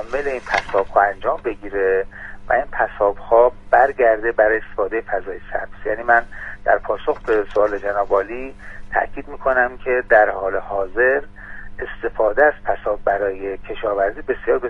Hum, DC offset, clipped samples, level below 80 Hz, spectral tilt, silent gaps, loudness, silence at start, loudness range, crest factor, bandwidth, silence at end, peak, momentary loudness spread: none; under 0.1%; under 0.1%; -38 dBFS; -6 dB/octave; none; -19 LUFS; 0 s; 3 LU; 18 dB; 7.8 kHz; 0 s; 0 dBFS; 13 LU